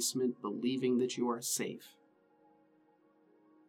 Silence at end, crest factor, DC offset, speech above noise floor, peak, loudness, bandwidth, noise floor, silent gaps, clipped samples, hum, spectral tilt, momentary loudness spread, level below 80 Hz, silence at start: 1.8 s; 16 dB; under 0.1%; 34 dB; -22 dBFS; -35 LUFS; 18 kHz; -69 dBFS; none; under 0.1%; none; -3.5 dB/octave; 6 LU; under -90 dBFS; 0 s